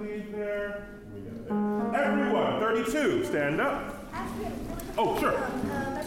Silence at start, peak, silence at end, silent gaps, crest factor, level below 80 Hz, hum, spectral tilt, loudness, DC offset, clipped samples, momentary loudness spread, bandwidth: 0 s; -14 dBFS; 0 s; none; 14 dB; -50 dBFS; none; -5.5 dB/octave; -29 LUFS; under 0.1%; under 0.1%; 11 LU; 16.5 kHz